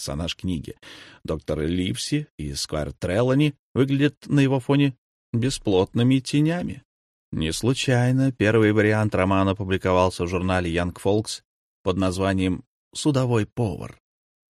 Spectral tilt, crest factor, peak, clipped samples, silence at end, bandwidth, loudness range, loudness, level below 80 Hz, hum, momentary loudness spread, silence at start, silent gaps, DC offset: -6 dB/octave; 18 dB; -4 dBFS; under 0.1%; 0.6 s; 13 kHz; 5 LU; -23 LUFS; -46 dBFS; none; 12 LU; 0 s; 2.30-2.38 s, 3.59-3.75 s, 4.17-4.21 s, 4.98-5.33 s, 6.85-7.32 s, 11.45-11.84 s, 12.67-12.91 s; under 0.1%